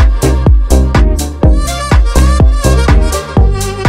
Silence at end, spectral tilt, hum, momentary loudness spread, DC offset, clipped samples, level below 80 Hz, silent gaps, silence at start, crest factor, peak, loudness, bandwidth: 0 s; -6 dB/octave; none; 3 LU; under 0.1%; under 0.1%; -10 dBFS; none; 0 s; 8 dB; 0 dBFS; -10 LUFS; 15.5 kHz